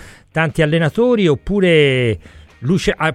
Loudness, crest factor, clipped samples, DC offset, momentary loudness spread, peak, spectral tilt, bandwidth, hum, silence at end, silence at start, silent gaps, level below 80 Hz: -15 LUFS; 14 dB; under 0.1%; under 0.1%; 10 LU; -2 dBFS; -6.5 dB/octave; 12 kHz; none; 0 s; 0 s; none; -38 dBFS